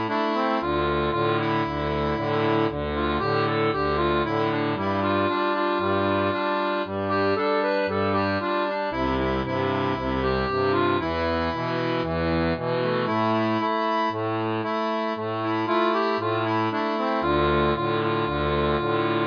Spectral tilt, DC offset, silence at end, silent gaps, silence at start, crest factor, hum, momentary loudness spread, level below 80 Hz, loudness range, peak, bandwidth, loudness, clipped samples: -8 dB/octave; under 0.1%; 0 s; none; 0 s; 14 dB; none; 3 LU; -42 dBFS; 1 LU; -10 dBFS; 5.2 kHz; -24 LUFS; under 0.1%